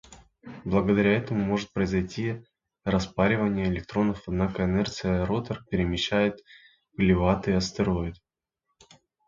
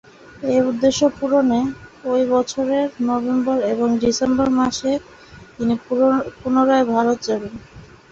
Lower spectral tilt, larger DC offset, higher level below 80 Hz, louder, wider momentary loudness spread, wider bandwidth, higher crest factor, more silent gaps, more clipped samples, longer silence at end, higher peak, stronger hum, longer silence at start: first, -6.5 dB/octave vs -5 dB/octave; neither; first, -44 dBFS vs -50 dBFS; second, -26 LUFS vs -19 LUFS; about the same, 10 LU vs 8 LU; about the same, 7.6 kHz vs 8 kHz; about the same, 20 dB vs 16 dB; neither; neither; first, 1.15 s vs 0.25 s; second, -8 dBFS vs -4 dBFS; neither; second, 0.1 s vs 0.35 s